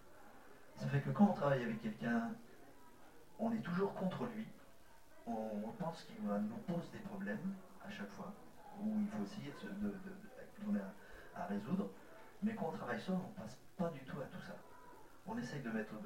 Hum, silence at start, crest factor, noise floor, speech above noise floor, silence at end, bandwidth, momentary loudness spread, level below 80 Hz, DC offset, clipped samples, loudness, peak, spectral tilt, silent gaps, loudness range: none; 0 s; 24 dB; -65 dBFS; 23 dB; 0 s; 16 kHz; 20 LU; -70 dBFS; 0.1%; under 0.1%; -42 LUFS; -20 dBFS; -7.5 dB/octave; none; 6 LU